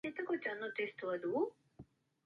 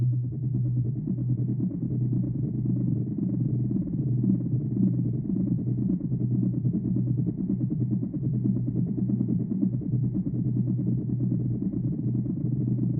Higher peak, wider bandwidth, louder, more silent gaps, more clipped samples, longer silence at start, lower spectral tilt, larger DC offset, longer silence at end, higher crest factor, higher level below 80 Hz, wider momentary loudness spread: second, -24 dBFS vs -12 dBFS; first, 5.4 kHz vs 1.2 kHz; second, -40 LUFS vs -27 LUFS; neither; neither; about the same, 0.05 s vs 0 s; second, -7 dB/octave vs -17.5 dB/octave; neither; first, 0.4 s vs 0 s; about the same, 16 dB vs 14 dB; second, -78 dBFS vs -50 dBFS; about the same, 3 LU vs 3 LU